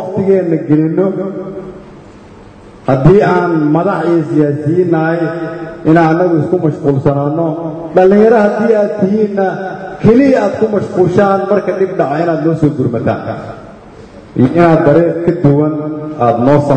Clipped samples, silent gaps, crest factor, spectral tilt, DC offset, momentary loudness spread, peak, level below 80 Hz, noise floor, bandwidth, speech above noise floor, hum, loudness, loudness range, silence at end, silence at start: 0.2%; none; 12 dB; -9 dB/octave; under 0.1%; 13 LU; 0 dBFS; -42 dBFS; -35 dBFS; 8.8 kHz; 25 dB; none; -11 LUFS; 3 LU; 0 s; 0 s